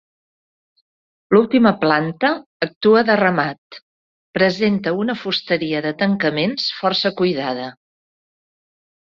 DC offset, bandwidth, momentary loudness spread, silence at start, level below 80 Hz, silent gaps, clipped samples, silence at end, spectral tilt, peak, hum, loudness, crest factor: under 0.1%; 7.2 kHz; 10 LU; 1.3 s; -60 dBFS; 2.46-2.60 s, 2.76-2.81 s, 3.58-3.70 s, 3.82-4.33 s; under 0.1%; 1.45 s; -6.5 dB/octave; -2 dBFS; none; -18 LUFS; 18 dB